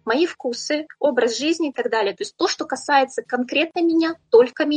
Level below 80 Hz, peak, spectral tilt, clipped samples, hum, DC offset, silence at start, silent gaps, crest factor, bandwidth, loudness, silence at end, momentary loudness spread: -72 dBFS; -4 dBFS; -2.5 dB/octave; under 0.1%; none; under 0.1%; 0.05 s; none; 18 dB; 9.4 kHz; -20 LUFS; 0 s; 9 LU